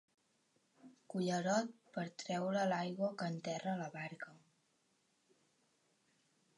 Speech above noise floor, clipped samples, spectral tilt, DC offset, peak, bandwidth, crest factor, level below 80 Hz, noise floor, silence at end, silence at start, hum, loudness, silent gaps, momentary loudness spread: 39 dB; under 0.1%; -5.5 dB/octave; under 0.1%; -24 dBFS; 11.5 kHz; 20 dB; under -90 dBFS; -79 dBFS; 2.2 s; 0.85 s; none; -40 LUFS; none; 11 LU